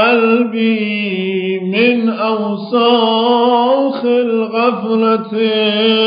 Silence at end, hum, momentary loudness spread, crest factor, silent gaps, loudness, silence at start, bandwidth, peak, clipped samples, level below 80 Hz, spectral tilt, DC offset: 0 s; none; 6 LU; 12 dB; none; -14 LUFS; 0 s; 5.2 kHz; -2 dBFS; under 0.1%; -78 dBFS; -3 dB/octave; under 0.1%